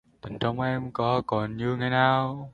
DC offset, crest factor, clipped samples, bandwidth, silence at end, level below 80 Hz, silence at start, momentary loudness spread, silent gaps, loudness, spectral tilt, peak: under 0.1%; 20 dB; under 0.1%; 7 kHz; 0.05 s; -56 dBFS; 0.25 s; 8 LU; none; -26 LUFS; -8 dB/octave; -8 dBFS